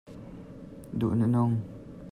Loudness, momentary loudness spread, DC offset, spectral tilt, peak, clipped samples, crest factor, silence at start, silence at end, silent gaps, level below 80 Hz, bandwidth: -28 LUFS; 20 LU; under 0.1%; -10 dB/octave; -16 dBFS; under 0.1%; 14 dB; 0.05 s; 0 s; none; -56 dBFS; 10.5 kHz